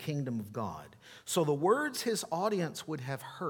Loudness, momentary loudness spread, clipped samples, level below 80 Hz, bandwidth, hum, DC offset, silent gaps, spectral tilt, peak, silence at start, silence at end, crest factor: -33 LUFS; 12 LU; under 0.1%; -72 dBFS; 19 kHz; none; under 0.1%; none; -5 dB/octave; -14 dBFS; 0 s; 0 s; 18 dB